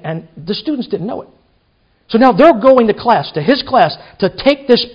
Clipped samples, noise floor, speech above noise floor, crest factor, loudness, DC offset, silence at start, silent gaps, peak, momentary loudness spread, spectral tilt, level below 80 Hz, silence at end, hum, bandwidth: 0.4%; -57 dBFS; 45 dB; 14 dB; -12 LUFS; under 0.1%; 0.05 s; none; 0 dBFS; 15 LU; -7.5 dB/octave; -48 dBFS; 0 s; none; 6.6 kHz